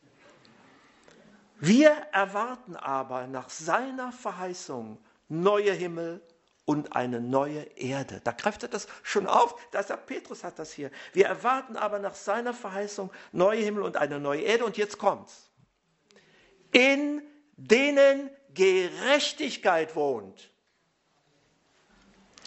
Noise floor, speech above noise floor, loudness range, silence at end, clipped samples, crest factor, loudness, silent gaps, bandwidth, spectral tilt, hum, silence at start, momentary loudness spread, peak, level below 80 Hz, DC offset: -72 dBFS; 45 dB; 6 LU; 2.15 s; under 0.1%; 26 dB; -27 LUFS; none; 8.2 kHz; -4.5 dB/octave; none; 1.6 s; 16 LU; -4 dBFS; -74 dBFS; under 0.1%